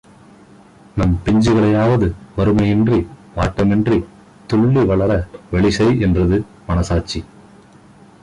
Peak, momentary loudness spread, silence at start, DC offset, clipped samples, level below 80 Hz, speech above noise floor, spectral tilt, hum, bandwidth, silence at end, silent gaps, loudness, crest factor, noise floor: -6 dBFS; 8 LU; 0.95 s; under 0.1%; under 0.1%; -30 dBFS; 30 dB; -7.5 dB/octave; none; 11 kHz; 1 s; none; -16 LUFS; 12 dB; -45 dBFS